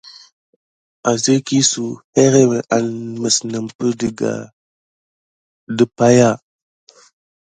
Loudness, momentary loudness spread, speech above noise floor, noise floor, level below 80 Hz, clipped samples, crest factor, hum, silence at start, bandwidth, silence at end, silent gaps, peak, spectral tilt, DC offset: -16 LUFS; 12 LU; over 74 dB; under -90 dBFS; -56 dBFS; under 0.1%; 18 dB; none; 0.05 s; 9.6 kHz; 1.2 s; 0.32-1.03 s, 2.04-2.13 s, 3.75-3.79 s, 4.53-5.67 s; 0 dBFS; -4.5 dB/octave; under 0.1%